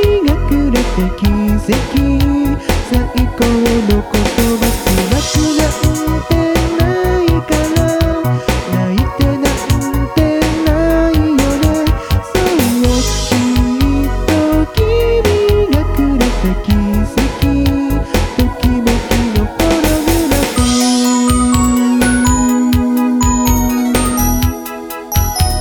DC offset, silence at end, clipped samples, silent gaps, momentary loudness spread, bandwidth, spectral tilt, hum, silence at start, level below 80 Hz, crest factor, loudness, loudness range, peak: under 0.1%; 0 s; under 0.1%; none; 4 LU; 19.5 kHz; -5.5 dB/octave; none; 0 s; -18 dBFS; 12 dB; -13 LUFS; 2 LU; 0 dBFS